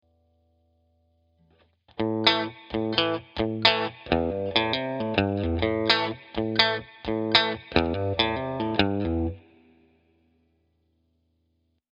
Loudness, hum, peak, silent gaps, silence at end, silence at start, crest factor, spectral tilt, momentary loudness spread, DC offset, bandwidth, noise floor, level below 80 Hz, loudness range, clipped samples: -25 LUFS; none; 0 dBFS; none; 2.55 s; 2 s; 28 dB; -6 dB/octave; 10 LU; under 0.1%; 8.2 kHz; -72 dBFS; -46 dBFS; 5 LU; under 0.1%